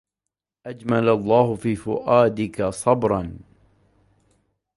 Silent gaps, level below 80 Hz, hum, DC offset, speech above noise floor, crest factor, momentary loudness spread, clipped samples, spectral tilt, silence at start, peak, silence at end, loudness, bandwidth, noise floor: none; -50 dBFS; none; under 0.1%; 65 dB; 20 dB; 15 LU; under 0.1%; -7 dB/octave; 0.65 s; -2 dBFS; 1.35 s; -21 LUFS; 11.5 kHz; -85 dBFS